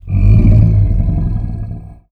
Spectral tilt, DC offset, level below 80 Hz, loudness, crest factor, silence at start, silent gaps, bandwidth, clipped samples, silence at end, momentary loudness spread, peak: -11.5 dB/octave; under 0.1%; -16 dBFS; -12 LUFS; 10 dB; 0.05 s; none; 2.7 kHz; under 0.1%; 0.2 s; 17 LU; 0 dBFS